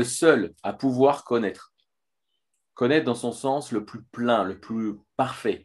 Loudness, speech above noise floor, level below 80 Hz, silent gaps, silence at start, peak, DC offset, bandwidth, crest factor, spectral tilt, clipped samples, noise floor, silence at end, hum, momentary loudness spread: -25 LUFS; 59 dB; -68 dBFS; none; 0 s; -2 dBFS; under 0.1%; 12.5 kHz; 22 dB; -5 dB/octave; under 0.1%; -84 dBFS; 0.05 s; none; 11 LU